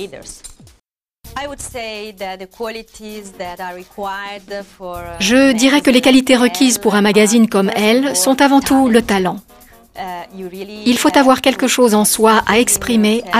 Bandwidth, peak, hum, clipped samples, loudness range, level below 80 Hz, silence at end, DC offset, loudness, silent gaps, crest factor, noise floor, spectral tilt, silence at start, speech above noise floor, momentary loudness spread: 15.5 kHz; 0 dBFS; none; under 0.1%; 16 LU; -44 dBFS; 0 s; under 0.1%; -12 LUFS; none; 14 dB; -60 dBFS; -3.5 dB/octave; 0 s; 46 dB; 19 LU